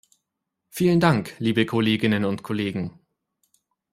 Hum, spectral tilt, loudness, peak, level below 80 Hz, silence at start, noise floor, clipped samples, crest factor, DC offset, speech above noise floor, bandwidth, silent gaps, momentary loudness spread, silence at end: none; -6.5 dB/octave; -22 LUFS; -4 dBFS; -58 dBFS; 0.75 s; -81 dBFS; under 0.1%; 20 dB; under 0.1%; 60 dB; 16 kHz; none; 11 LU; 1.05 s